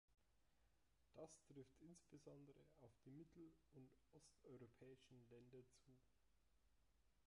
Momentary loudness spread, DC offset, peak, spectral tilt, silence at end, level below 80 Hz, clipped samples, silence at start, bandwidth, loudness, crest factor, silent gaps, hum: 4 LU; under 0.1%; -48 dBFS; -6 dB/octave; 0.05 s; -86 dBFS; under 0.1%; 0.1 s; 11 kHz; -67 LUFS; 20 dB; none; none